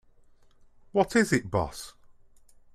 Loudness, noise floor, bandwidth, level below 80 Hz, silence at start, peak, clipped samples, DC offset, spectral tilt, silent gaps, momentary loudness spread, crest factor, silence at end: -27 LUFS; -57 dBFS; 14.5 kHz; -54 dBFS; 0.95 s; -8 dBFS; under 0.1%; under 0.1%; -5 dB/octave; none; 17 LU; 22 dB; 0.85 s